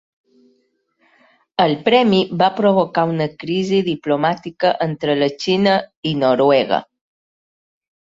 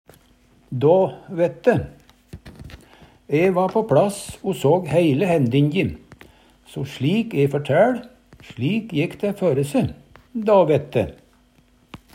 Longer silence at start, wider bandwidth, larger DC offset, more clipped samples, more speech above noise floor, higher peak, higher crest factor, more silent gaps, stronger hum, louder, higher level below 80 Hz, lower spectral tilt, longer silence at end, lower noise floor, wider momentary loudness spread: first, 1.6 s vs 0.7 s; second, 7.8 kHz vs 16 kHz; neither; neither; first, 48 dB vs 37 dB; first, 0 dBFS vs -4 dBFS; about the same, 18 dB vs 18 dB; first, 5.97-6.03 s vs none; neither; first, -17 LUFS vs -20 LUFS; second, -60 dBFS vs -52 dBFS; about the same, -6.5 dB/octave vs -7 dB/octave; first, 1.15 s vs 0.2 s; first, -64 dBFS vs -57 dBFS; second, 7 LU vs 14 LU